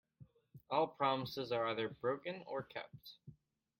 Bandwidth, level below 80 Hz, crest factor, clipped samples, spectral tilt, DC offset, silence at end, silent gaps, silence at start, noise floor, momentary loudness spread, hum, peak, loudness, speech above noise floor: 16.5 kHz; -78 dBFS; 22 dB; under 0.1%; -6 dB/octave; under 0.1%; 0.45 s; none; 0.2 s; -65 dBFS; 18 LU; none; -20 dBFS; -40 LUFS; 25 dB